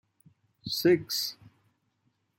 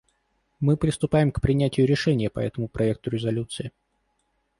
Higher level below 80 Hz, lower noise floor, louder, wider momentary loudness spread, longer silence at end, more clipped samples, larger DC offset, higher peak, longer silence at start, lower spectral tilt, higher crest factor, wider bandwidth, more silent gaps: second, -70 dBFS vs -44 dBFS; about the same, -75 dBFS vs -72 dBFS; second, -28 LUFS vs -24 LUFS; first, 11 LU vs 8 LU; first, 1.05 s vs 0.9 s; neither; neither; about the same, -12 dBFS vs -10 dBFS; about the same, 0.65 s vs 0.6 s; second, -4 dB/octave vs -7 dB/octave; about the same, 20 dB vs 16 dB; first, 16.5 kHz vs 11.5 kHz; neither